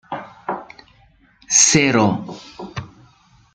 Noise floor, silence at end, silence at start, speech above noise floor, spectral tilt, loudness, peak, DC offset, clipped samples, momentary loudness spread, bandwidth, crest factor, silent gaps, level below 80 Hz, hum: -54 dBFS; 0.65 s; 0.1 s; 38 dB; -2.5 dB/octave; -15 LUFS; 0 dBFS; under 0.1%; under 0.1%; 22 LU; 10.5 kHz; 22 dB; none; -54 dBFS; none